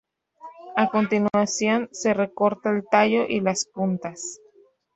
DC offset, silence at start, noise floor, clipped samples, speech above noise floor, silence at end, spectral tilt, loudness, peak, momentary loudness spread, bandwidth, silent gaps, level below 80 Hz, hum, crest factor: under 0.1%; 0.45 s; -57 dBFS; under 0.1%; 35 dB; 0.6 s; -4.5 dB/octave; -23 LUFS; -4 dBFS; 10 LU; 8.2 kHz; none; -66 dBFS; none; 20 dB